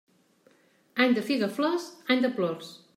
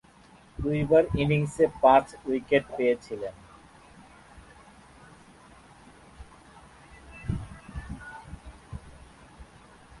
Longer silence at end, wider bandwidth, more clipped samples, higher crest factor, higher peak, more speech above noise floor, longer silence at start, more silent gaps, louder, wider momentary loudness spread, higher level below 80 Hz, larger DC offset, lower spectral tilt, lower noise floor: second, 0.2 s vs 0.55 s; first, 15.5 kHz vs 11.5 kHz; neither; second, 18 dB vs 24 dB; second, -10 dBFS vs -6 dBFS; first, 36 dB vs 31 dB; first, 0.95 s vs 0.6 s; neither; about the same, -27 LUFS vs -25 LUFS; second, 8 LU vs 24 LU; second, -84 dBFS vs -48 dBFS; neither; second, -5 dB/octave vs -7 dB/octave; first, -63 dBFS vs -55 dBFS